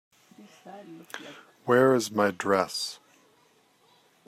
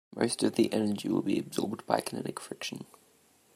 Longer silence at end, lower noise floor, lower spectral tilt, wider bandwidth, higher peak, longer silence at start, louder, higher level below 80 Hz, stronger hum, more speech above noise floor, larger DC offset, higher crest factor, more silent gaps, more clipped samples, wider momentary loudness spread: first, 1.35 s vs 0.7 s; about the same, -64 dBFS vs -65 dBFS; about the same, -4.5 dB/octave vs -5 dB/octave; about the same, 15.5 kHz vs 16 kHz; about the same, -8 dBFS vs -10 dBFS; first, 0.4 s vs 0.15 s; first, -25 LUFS vs -31 LUFS; about the same, -76 dBFS vs -76 dBFS; neither; about the same, 37 dB vs 34 dB; neither; about the same, 20 dB vs 22 dB; neither; neither; first, 25 LU vs 11 LU